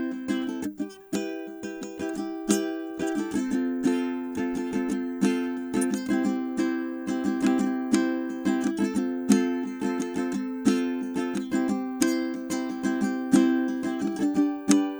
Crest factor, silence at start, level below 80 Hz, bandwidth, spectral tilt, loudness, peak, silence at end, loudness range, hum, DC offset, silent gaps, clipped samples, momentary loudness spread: 24 dB; 0 s; -62 dBFS; over 20 kHz; -5 dB/octave; -27 LUFS; -2 dBFS; 0 s; 3 LU; none; under 0.1%; none; under 0.1%; 9 LU